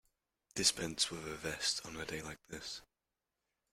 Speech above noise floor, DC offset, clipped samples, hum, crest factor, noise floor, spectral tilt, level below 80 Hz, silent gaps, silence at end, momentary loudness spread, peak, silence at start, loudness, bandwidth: 50 dB; under 0.1%; under 0.1%; none; 26 dB; -90 dBFS; -1.5 dB/octave; -66 dBFS; none; 0.9 s; 14 LU; -14 dBFS; 0.55 s; -37 LUFS; 16 kHz